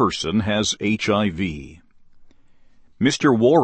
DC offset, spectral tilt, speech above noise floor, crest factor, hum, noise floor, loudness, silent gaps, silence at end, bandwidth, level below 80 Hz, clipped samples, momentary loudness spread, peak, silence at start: under 0.1%; -5 dB/octave; 30 dB; 18 dB; none; -49 dBFS; -20 LUFS; none; 0 s; 8.8 kHz; -48 dBFS; under 0.1%; 10 LU; -4 dBFS; 0 s